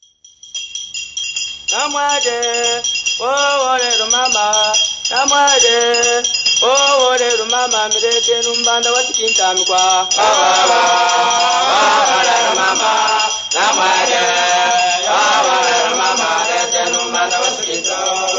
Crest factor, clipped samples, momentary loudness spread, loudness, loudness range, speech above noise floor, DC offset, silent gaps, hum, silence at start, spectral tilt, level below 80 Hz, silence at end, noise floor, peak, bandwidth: 14 dB; under 0.1%; 5 LU; -12 LUFS; 3 LU; 29 dB; under 0.1%; none; none; 0.45 s; 1 dB/octave; -56 dBFS; 0 s; -43 dBFS; 0 dBFS; 8 kHz